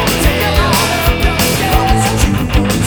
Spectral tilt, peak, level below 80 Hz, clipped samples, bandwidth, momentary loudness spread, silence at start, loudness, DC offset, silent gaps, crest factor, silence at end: -4.5 dB/octave; 0 dBFS; -18 dBFS; under 0.1%; over 20 kHz; 2 LU; 0 s; -12 LUFS; under 0.1%; none; 12 dB; 0 s